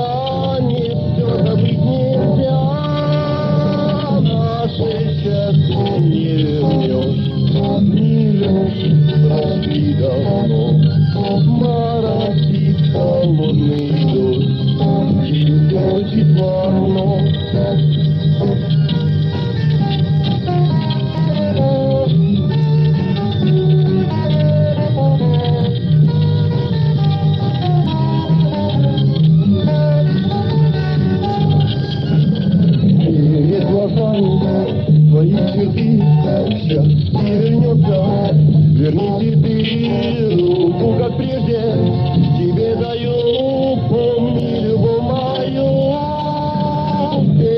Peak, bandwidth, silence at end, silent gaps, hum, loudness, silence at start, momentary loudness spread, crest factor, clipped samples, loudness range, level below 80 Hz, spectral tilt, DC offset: -2 dBFS; 5.6 kHz; 0 s; none; none; -15 LUFS; 0 s; 4 LU; 12 dB; under 0.1%; 2 LU; -44 dBFS; -10.5 dB/octave; under 0.1%